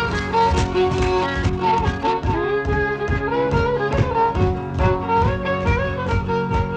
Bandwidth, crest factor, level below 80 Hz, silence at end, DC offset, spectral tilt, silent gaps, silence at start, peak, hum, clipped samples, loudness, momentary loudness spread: 9.2 kHz; 14 dB; -28 dBFS; 0 s; under 0.1%; -7 dB/octave; none; 0 s; -6 dBFS; none; under 0.1%; -20 LUFS; 3 LU